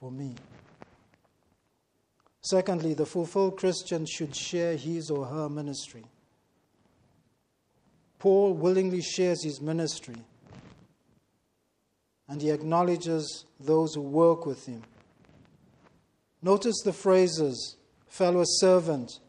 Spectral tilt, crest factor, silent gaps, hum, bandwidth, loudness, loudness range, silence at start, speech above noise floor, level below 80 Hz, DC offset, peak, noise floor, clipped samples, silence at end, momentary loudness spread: -5 dB/octave; 18 dB; none; none; 10.5 kHz; -27 LUFS; 7 LU; 0 s; 48 dB; -72 dBFS; under 0.1%; -10 dBFS; -75 dBFS; under 0.1%; 0.1 s; 16 LU